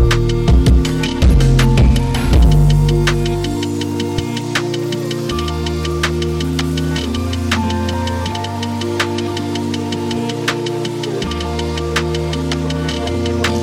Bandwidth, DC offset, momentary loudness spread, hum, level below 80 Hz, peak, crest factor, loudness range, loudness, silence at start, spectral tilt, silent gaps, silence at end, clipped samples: 16 kHz; under 0.1%; 8 LU; none; -20 dBFS; -2 dBFS; 14 dB; 6 LU; -17 LUFS; 0 s; -6 dB/octave; none; 0 s; under 0.1%